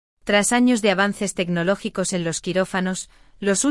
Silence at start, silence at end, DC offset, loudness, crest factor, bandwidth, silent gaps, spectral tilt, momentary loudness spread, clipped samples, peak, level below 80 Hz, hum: 0.25 s; 0 s; under 0.1%; -21 LUFS; 18 dB; 12 kHz; none; -4 dB/octave; 9 LU; under 0.1%; -4 dBFS; -52 dBFS; none